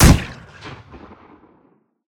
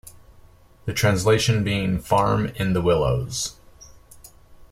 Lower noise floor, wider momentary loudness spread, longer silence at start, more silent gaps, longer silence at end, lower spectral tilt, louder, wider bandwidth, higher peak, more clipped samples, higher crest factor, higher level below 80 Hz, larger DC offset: first, -58 dBFS vs -50 dBFS; first, 26 LU vs 9 LU; about the same, 0 s vs 0.05 s; neither; first, 1.4 s vs 0.1 s; about the same, -5 dB/octave vs -5 dB/octave; first, -17 LUFS vs -22 LUFS; first, 18 kHz vs 16 kHz; first, 0 dBFS vs -4 dBFS; neither; about the same, 20 dB vs 18 dB; first, -24 dBFS vs -42 dBFS; neither